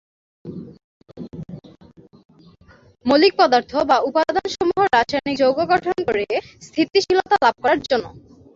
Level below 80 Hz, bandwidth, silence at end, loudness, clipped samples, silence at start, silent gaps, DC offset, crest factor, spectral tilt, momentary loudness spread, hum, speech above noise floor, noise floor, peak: -54 dBFS; 7.8 kHz; 0.4 s; -18 LUFS; under 0.1%; 0.45 s; 0.84-1.00 s, 2.25-2.29 s; under 0.1%; 18 dB; -4.5 dB/octave; 21 LU; none; 32 dB; -50 dBFS; -2 dBFS